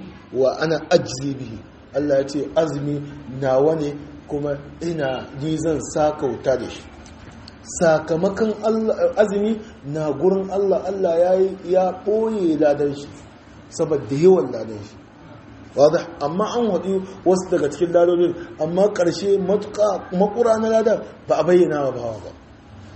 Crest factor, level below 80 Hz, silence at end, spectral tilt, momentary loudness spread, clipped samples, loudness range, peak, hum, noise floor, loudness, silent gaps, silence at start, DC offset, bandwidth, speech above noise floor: 18 dB; -50 dBFS; 0 s; -6 dB/octave; 13 LU; under 0.1%; 4 LU; -2 dBFS; none; -42 dBFS; -20 LUFS; none; 0 s; under 0.1%; 8.6 kHz; 23 dB